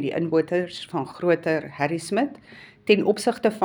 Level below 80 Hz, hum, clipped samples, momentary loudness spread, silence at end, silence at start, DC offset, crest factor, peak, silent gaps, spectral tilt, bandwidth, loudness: -68 dBFS; none; under 0.1%; 10 LU; 0 s; 0 s; under 0.1%; 20 dB; -4 dBFS; none; -5.5 dB/octave; over 20 kHz; -24 LUFS